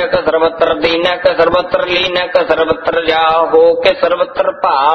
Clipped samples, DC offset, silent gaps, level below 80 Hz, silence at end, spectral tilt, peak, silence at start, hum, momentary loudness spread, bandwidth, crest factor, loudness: 0.1%; under 0.1%; none; -42 dBFS; 0 s; -5 dB/octave; 0 dBFS; 0 s; none; 4 LU; 6.4 kHz; 12 dB; -12 LUFS